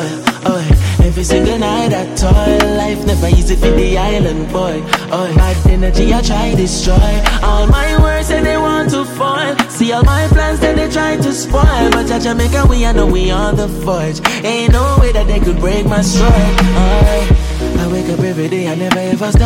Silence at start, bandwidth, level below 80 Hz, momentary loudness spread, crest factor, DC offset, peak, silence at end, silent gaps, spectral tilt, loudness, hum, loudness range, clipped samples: 0 s; 16 kHz; -14 dBFS; 5 LU; 10 dB; under 0.1%; 0 dBFS; 0 s; none; -5.5 dB/octave; -13 LUFS; none; 1 LU; under 0.1%